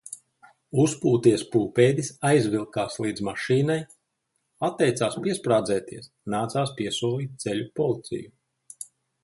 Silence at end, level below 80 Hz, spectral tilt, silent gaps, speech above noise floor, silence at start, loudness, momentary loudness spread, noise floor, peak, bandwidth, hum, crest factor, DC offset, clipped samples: 0.4 s; -62 dBFS; -5.5 dB/octave; none; 52 dB; 0.1 s; -25 LUFS; 18 LU; -77 dBFS; -6 dBFS; 11.5 kHz; none; 20 dB; under 0.1%; under 0.1%